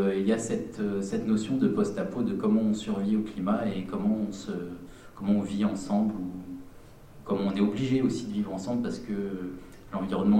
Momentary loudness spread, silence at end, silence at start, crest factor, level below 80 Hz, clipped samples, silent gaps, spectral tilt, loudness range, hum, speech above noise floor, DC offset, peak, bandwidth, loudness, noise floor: 12 LU; 0 s; 0 s; 16 dB; -54 dBFS; under 0.1%; none; -7 dB/octave; 3 LU; none; 21 dB; under 0.1%; -12 dBFS; 10 kHz; -29 LUFS; -49 dBFS